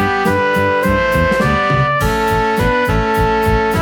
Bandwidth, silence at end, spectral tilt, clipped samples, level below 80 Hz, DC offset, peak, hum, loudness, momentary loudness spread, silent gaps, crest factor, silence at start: 19 kHz; 0 s; -6 dB/octave; under 0.1%; -26 dBFS; under 0.1%; -2 dBFS; none; -14 LUFS; 1 LU; none; 12 dB; 0 s